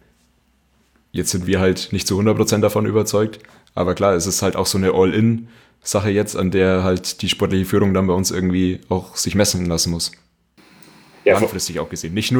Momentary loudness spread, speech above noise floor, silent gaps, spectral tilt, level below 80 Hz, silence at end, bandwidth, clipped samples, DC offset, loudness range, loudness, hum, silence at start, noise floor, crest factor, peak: 7 LU; 42 dB; none; -4.5 dB/octave; -46 dBFS; 0 s; over 20 kHz; under 0.1%; under 0.1%; 2 LU; -18 LUFS; none; 1.15 s; -60 dBFS; 16 dB; -2 dBFS